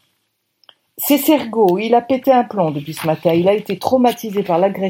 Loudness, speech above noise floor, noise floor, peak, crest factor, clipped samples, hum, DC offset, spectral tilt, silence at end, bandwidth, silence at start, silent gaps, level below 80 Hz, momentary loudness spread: -16 LUFS; 53 dB; -69 dBFS; 0 dBFS; 16 dB; under 0.1%; none; under 0.1%; -5.5 dB/octave; 0 s; 17 kHz; 1 s; none; -64 dBFS; 7 LU